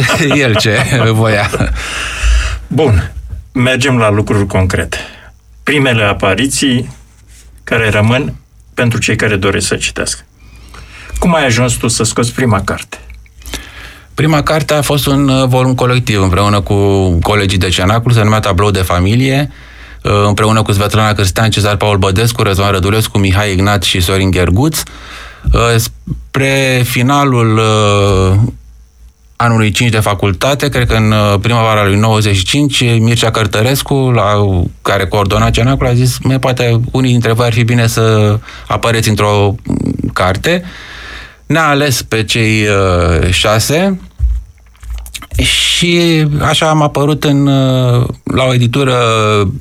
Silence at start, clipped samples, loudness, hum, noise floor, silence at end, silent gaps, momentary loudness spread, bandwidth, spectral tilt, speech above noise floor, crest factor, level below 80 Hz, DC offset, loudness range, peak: 0 s; under 0.1%; -11 LUFS; none; -40 dBFS; 0 s; none; 9 LU; 16 kHz; -5 dB/octave; 30 dB; 10 dB; -26 dBFS; under 0.1%; 3 LU; 0 dBFS